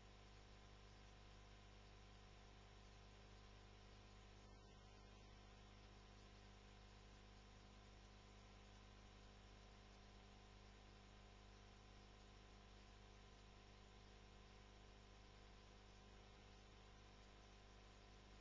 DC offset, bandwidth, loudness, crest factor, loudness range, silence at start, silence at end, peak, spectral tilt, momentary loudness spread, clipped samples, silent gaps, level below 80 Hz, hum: under 0.1%; 7.2 kHz; -66 LUFS; 12 dB; 0 LU; 0 s; 0 s; -52 dBFS; -4 dB/octave; 1 LU; under 0.1%; none; -68 dBFS; 50 Hz at -65 dBFS